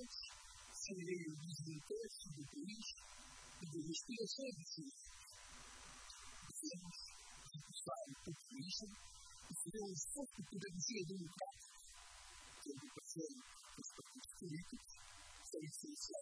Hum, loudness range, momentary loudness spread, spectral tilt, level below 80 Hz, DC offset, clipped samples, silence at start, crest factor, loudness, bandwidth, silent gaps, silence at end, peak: none; 5 LU; 12 LU; -3.5 dB/octave; -72 dBFS; under 0.1%; under 0.1%; 0 s; 20 dB; -51 LUFS; 11 kHz; none; 0 s; -32 dBFS